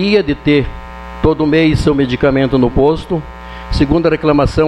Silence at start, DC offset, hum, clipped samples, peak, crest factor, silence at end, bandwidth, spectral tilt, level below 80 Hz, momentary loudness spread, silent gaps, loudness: 0 s; under 0.1%; none; under 0.1%; 0 dBFS; 12 dB; 0 s; 10.5 kHz; -7.5 dB/octave; -26 dBFS; 12 LU; none; -13 LUFS